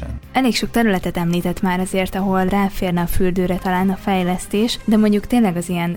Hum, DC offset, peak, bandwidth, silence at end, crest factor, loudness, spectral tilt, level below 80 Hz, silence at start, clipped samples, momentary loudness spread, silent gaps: none; under 0.1%; -4 dBFS; 18.5 kHz; 0 s; 14 dB; -19 LUFS; -6 dB/octave; -32 dBFS; 0 s; under 0.1%; 4 LU; none